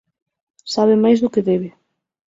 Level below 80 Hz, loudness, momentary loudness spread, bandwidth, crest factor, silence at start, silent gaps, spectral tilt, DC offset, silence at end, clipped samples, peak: -62 dBFS; -17 LUFS; 17 LU; 7.8 kHz; 16 dB; 0.65 s; none; -6.5 dB/octave; under 0.1%; 0.65 s; under 0.1%; -4 dBFS